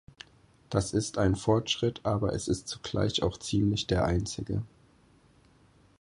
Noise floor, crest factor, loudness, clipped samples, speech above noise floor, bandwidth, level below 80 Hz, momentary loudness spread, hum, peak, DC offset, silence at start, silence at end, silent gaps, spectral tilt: -62 dBFS; 20 dB; -30 LUFS; under 0.1%; 33 dB; 11 kHz; -46 dBFS; 9 LU; none; -12 dBFS; under 0.1%; 0.7 s; 1.35 s; none; -5.5 dB/octave